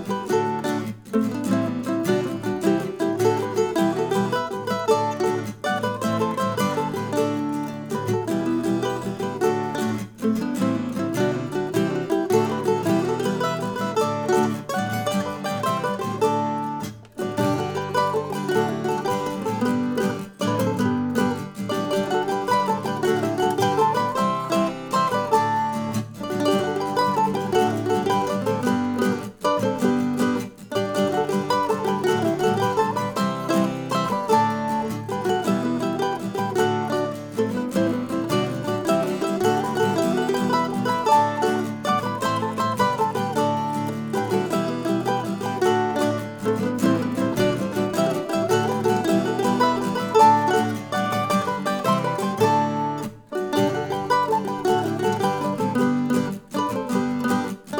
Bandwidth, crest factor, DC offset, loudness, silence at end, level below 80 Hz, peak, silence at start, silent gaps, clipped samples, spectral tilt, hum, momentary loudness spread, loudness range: over 20 kHz; 18 dB; under 0.1%; -23 LUFS; 0 s; -60 dBFS; -4 dBFS; 0 s; none; under 0.1%; -5.5 dB/octave; none; 5 LU; 4 LU